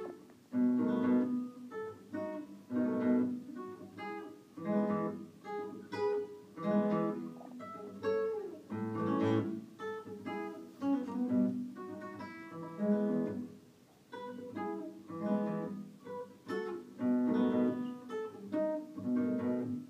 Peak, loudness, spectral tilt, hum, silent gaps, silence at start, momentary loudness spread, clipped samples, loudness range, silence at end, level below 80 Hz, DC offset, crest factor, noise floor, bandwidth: -20 dBFS; -37 LUFS; -8.5 dB/octave; none; none; 0 s; 15 LU; under 0.1%; 4 LU; 0 s; -84 dBFS; under 0.1%; 16 dB; -62 dBFS; 8.6 kHz